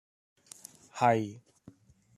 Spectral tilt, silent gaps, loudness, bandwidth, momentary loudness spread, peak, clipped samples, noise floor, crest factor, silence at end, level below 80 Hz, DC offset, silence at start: -6 dB/octave; none; -29 LUFS; 13.5 kHz; 25 LU; -12 dBFS; under 0.1%; -58 dBFS; 22 dB; 0.8 s; -74 dBFS; under 0.1%; 0.95 s